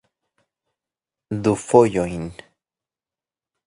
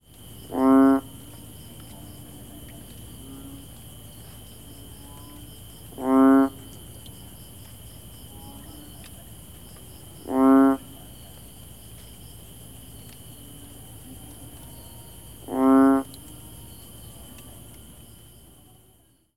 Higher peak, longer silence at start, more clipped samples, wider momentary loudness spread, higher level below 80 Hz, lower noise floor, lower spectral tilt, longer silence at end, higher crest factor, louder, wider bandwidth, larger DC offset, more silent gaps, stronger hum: first, 0 dBFS vs -10 dBFS; first, 1.3 s vs 0.5 s; neither; second, 16 LU vs 26 LU; about the same, -52 dBFS vs -52 dBFS; first, under -90 dBFS vs -60 dBFS; about the same, -6.5 dB/octave vs -6 dB/octave; second, 1.35 s vs 3.35 s; first, 24 dB vs 18 dB; about the same, -19 LUFS vs -20 LUFS; second, 11.5 kHz vs 16.5 kHz; second, under 0.1% vs 0.3%; neither; neither